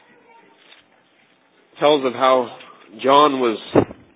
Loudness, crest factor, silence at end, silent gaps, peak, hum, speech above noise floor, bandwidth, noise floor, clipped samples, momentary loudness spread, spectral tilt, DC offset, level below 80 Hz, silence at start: -17 LUFS; 20 dB; 0.25 s; none; 0 dBFS; none; 41 dB; 4 kHz; -57 dBFS; under 0.1%; 8 LU; -9.5 dB/octave; under 0.1%; -56 dBFS; 1.8 s